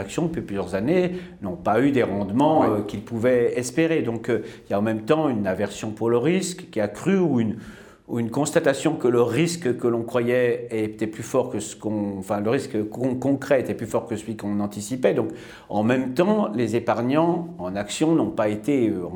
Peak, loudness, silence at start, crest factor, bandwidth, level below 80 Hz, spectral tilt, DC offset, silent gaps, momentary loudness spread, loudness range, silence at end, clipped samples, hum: -4 dBFS; -23 LUFS; 0 s; 18 dB; 20 kHz; -56 dBFS; -6 dB/octave; under 0.1%; none; 8 LU; 3 LU; 0 s; under 0.1%; none